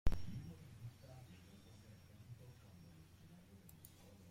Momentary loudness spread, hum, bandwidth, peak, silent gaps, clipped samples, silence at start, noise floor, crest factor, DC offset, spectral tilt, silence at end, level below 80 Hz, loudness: 11 LU; none; 16 kHz; -20 dBFS; none; under 0.1%; 0.05 s; -62 dBFS; 24 dB; under 0.1%; -6.5 dB/octave; 0.45 s; -52 dBFS; -57 LUFS